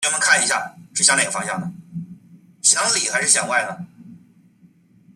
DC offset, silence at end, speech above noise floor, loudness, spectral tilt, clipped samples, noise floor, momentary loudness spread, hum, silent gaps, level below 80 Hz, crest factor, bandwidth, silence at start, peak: under 0.1%; 1 s; 34 dB; -17 LUFS; -0.5 dB/octave; under 0.1%; -53 dBFS; 20 LU; none; none; -68 dBFS; 20 dB; 15 kHz; 0 s; -2 dBFS